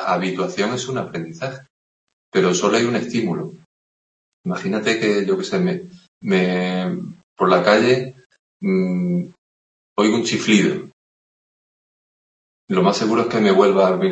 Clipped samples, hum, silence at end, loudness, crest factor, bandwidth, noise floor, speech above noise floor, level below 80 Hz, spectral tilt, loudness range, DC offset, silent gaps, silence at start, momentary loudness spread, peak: under 0.1%; none; 0 s; -19 LUFS; 18 dB; 8.6 kHz; under -90 dBFS; over 72 dB; -64 dBFS; -5.5 dB/octave; 3 LU; under 0.1%; 1.70-2.32 s, 3.66-4.44 s, 6.08-6.21 s, 7.23-7.36 s, 8.26-8.30 s, 8.39-8.60 s, 9.38-9.96 s, 10.93-12.68 s; 0 s; 15 LU; -2 dBFS